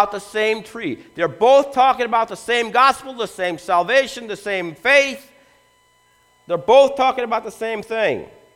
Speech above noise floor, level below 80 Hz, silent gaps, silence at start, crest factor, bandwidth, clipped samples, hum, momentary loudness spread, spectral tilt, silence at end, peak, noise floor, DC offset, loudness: 39 dB; -58 dBFS; none; 0 s; 18 dB; 14.5 kHz; under 0.1%; 60 Hz at -60 dBFS; 13 LU; -3.5 dB/octave; 0.3 s; -2 dBFS; -58 dBFS; under 0.1%; -18 LUFS